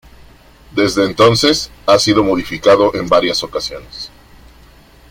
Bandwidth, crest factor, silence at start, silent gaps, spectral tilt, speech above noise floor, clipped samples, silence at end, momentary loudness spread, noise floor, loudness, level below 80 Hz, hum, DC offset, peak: 16.5 kHz; 16 dB; 0.75 s; none; -4 dB/octave; 30 dB; under 0.1%; 1.05 s; 15 LU; -43 dBFS; -13 LUFS; -42 dBFS; none; under 0.1%; 0 dBFS